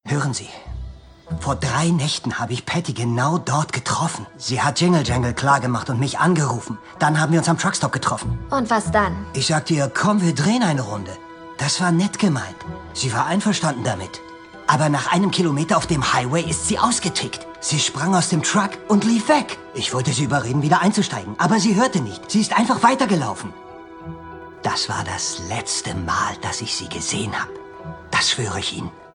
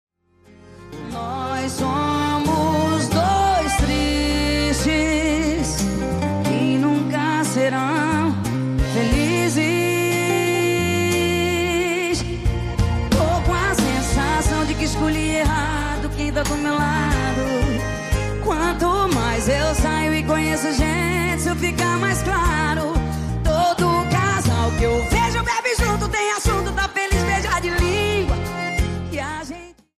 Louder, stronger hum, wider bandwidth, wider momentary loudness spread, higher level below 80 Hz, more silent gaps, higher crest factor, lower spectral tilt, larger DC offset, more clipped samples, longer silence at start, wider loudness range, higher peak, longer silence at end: about the same, -20 LUFS vs -20 LUFS; neither; second, 10.5 kHz vs 15.5 kHz; first, 14 LU vs 5 LU; second, -44 dBFS vs -28 dBFS; neither; first, 20 dB vs 12 dB; about the same, -4.5 dB/octave vs -5 dB/octave; neither; neither; second, 0.05 s vs 0.65 s; about the same, 4 LU vs 2 LU; first, 0 dBFS vs -8 dBFS; second, 0.05 s vs 0.25 s